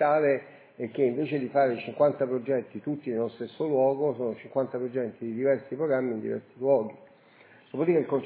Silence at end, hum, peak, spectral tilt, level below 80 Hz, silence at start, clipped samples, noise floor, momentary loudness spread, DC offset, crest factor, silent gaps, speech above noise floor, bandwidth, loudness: 0 s; none; -12 dBFS; -11 dB/octave; -80 dBFS; 0 s; under 0.1%; -56 dBFS; 9 LU; under 0.1%; 16 dB; none; 29 dB; 4 kHz; -28 LUFS